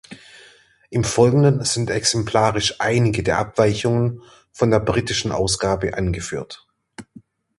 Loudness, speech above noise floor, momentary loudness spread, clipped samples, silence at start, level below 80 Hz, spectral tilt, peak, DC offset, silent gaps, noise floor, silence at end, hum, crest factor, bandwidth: -19 LUFS; 32 dB; 11 LU; under 0.1%; 0.1 s; -42 dBFS; -5 dB/octave; -2 dBFS; under 0.1%; none; -51 dBFS; 0.4 s; none; 18 dB; 11.5 kHz